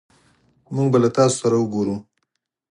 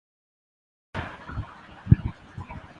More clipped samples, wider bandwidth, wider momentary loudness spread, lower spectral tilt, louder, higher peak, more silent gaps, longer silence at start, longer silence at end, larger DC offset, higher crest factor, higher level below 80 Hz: neither; first, 11.5 kHz vs 6.4 kHz; second, 11 LU vs 19 LU; second, -6 dB/octave vs -9 dB/octave; first, -19 LUFS vs -28 LUFS; about the same, -4 dBFS vs -2 dBFS; neither; second, 0.7 s vs 0.95 s; first, 0.7 s vs 0.1 s; neither; second, 18 dB vs 28 dB; second, -60 dBFS vs -38 dBFS